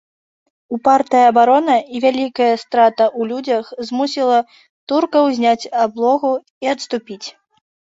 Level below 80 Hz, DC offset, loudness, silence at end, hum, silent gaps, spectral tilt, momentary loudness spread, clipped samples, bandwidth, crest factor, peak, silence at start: -66 dBFS; under 0.1%; -16 LUFS; 0.6 s; none; 4.69-4.87 s, 6.50-6.61 s; -4 dB/octave; 12 LU; under 0.1%; 7.8 kHz; 14 dB; -2 dBFS; 0.7 s